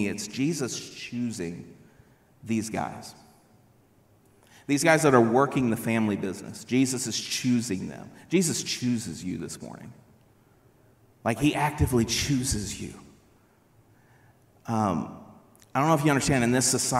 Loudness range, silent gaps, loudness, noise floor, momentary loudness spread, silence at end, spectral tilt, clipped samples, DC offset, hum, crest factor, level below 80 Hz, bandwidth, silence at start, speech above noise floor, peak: 10 LU; none; -26 LUFS; -61 dBFS; 17 LU; 0 s; -4.5 dB/octave; under 0.1%; under 0.1%; none; 22 dB; -50 dBFS; 16 kHz; 0 s; 35 dB; -6 dBFS